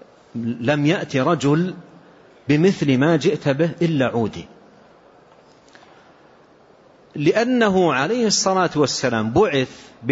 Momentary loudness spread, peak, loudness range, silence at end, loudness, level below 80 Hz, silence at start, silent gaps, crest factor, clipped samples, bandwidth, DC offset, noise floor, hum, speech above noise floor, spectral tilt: 12 LU; -6 dBFS; 9 LU; 0 s; -19 LUFS; -54 dBFS; 0.35 s; none; 16 dB; under 0.1%; 8 kHz; under 0.1%; -51 dBFS; none; 32 dB; -5 dB/octave